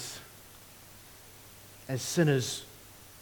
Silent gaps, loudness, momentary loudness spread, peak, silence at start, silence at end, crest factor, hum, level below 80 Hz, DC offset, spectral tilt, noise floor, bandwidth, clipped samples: none; -30 LUFS; 23 LU; -14 dBFS; 0 s; 0 s; 22 dB; none; -64 dBFS; under 0.1%; -4.5 dB/octave; -52 dBFS; 19 kHz; under 0.1%